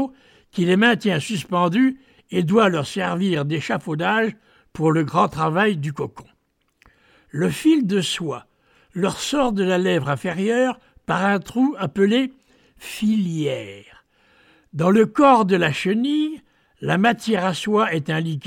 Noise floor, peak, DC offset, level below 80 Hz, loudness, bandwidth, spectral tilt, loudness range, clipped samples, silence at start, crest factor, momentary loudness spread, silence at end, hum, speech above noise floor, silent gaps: -67 dBFS; -4 dBFS; under 0.1%; -56 dBFS; -20 LUFS; 16 kHz; -6 dB/octave; 4 LU; under 0.1%; 0 s; 18 dB; 13 LU; 0 s; none; 47 dB; none